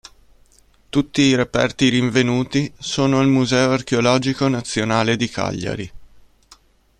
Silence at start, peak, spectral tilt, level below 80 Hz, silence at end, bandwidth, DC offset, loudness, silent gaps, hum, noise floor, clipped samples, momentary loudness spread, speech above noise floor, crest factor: 0.95 s; 0 dBFS; -5 dB/octave; -48 dBFS; 0.95 s; 10.5 kHz; under 0.1%; -18 LUFS; none; none; -53 dBFS; under 0.1%; 8 LU; 35 dB; 18 dB